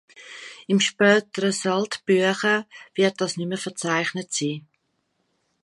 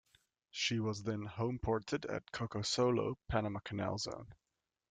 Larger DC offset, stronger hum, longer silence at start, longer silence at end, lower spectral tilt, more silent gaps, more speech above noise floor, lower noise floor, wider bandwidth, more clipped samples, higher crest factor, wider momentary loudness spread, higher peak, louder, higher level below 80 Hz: neither; neither; second, 0.2 s vs 0.55 s; first, 1.05 s vs 0.55 s; about the same, -4 dB/octave vs -5 dB/octave; neither; first, 50 dB vs 35 dB; about the same, -73 dBFS vs -72 dBFS; first, 11.5 kHz vs 9.4 kHz; neither; about the same, 20 dB vs 20 dB; first, 16 LU vs 8 LU; first, -4 dBFS vs -20 dBFS; first, -23 LUFS vs -38 LUFS; second, -74 dBFS vs -60 dBFS